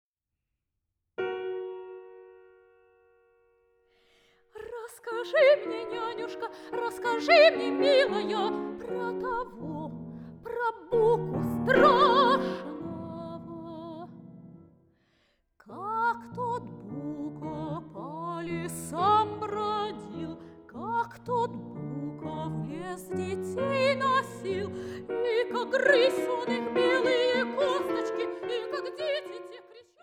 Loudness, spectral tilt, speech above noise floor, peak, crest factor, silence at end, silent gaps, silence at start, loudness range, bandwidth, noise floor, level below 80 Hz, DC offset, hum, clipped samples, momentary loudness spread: -28 LUFS; -5 dB/octave; 60 dB; -8 dBFS; 22 dB; 0.2 s; none; 1.2 s; 15 LU; 16 kHz; -85 dBFS; -62 dBFS; under 0.1%; none; under 0.1%; 19 LU